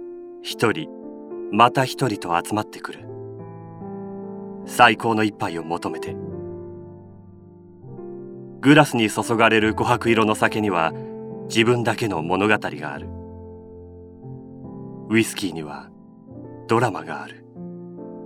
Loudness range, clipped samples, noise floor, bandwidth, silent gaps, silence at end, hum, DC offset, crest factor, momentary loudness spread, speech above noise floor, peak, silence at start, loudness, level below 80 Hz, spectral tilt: 10 LU; under 0.1%; -45 dBFS; 16 kHz; none; 0 s; none; under 0.1%; 22 dB; 22 LU; 25 dB; 0 dBFS; 0 s; -20 LUFS; -56 dBFS; -5 dB/octave